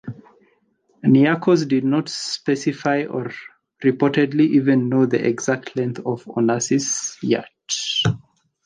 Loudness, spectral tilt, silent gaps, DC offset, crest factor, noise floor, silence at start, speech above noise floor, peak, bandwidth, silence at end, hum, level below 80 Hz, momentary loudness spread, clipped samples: -20 LUFS; -5 dB/octave; none; under 0.1%; 16 dB; -63 dBFS; 0.05 s; 43 dB; -4 dBFS; 10 kHz; 0.5 s; none; -60 dBFS; 10 LU; under 0.1%